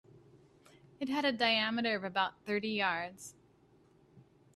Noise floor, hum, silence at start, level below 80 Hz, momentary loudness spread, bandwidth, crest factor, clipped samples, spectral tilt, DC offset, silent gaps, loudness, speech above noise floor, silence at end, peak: -66 dBFS; none; 0.15 s; -76 dBFS; 14 LU; 13.5 kHz; 22 dB; under 0.1%; -4 dB/octave; under 0.1%; none; -33 LUFS; 32 dB; 0.35 s; -14 dBFS